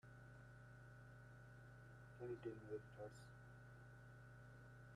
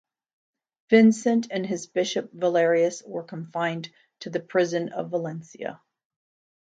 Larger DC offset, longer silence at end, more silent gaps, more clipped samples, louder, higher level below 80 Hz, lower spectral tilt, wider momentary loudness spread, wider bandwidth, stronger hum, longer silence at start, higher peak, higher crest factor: neither; second, 0 s vs 1 s; neither; neither; second, -59 LUFS vs -24 LUFS; about the same, -74 dBFS vs -76 dBFS; first, -7.5 dB/octave vs -5.5 dB/octave; second, 10 LU vs 17 LU; first, 12.5 kHz vs 9.2 kHz; neither; second, 0.05 s vs 0.9 s; second, -40 dBFS vs -4 dBFS; about the same, 18 dB vs 20 dB